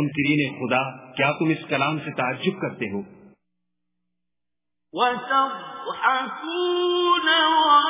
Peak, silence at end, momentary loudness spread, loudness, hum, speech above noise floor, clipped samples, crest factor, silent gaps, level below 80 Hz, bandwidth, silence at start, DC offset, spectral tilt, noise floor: -6 dBFS; 0 s; 13 LU; -22 LUFS; none; 65 dB; under 0.1%; 18 dB; none; -68 dBFS; 3.9 kHz; 0 s; under 0.1%; -2.5 dB/octave; -87 dBFS